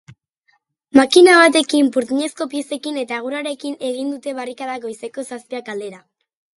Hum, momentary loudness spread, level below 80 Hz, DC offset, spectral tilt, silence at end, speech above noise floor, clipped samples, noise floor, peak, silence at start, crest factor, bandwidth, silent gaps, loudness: none; 19 LU; -62 dBFS; under 0.1%; -2.5 dB/octave; 0.6 s; 47 dB; under 0.1%; -64 dBFS; 0 dBFS; 0.95 s; 18 dB; 11.5 kHz; none; -17 LUFS